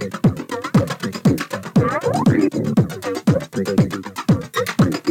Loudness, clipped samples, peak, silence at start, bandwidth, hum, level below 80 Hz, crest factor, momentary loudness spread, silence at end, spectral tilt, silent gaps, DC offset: -19 LUFS; under 0.1%; -4 dBFS; 0 s; 16.5 kHz; none; -48 dBFS; 14 dB; 5 LU; 0 s; -7 dB/octave; none; under 0.1%